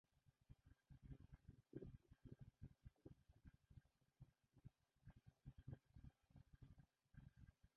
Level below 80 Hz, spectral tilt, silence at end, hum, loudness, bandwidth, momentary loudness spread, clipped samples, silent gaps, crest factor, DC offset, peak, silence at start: -72 dBFS; -9 dB/octave; 0.1 s; none; -66 LUFS; 4.3 kHz; 8 LU; under 0.1%; none; 26 dB; under 0.1%; -42 dBFS; 0.1 s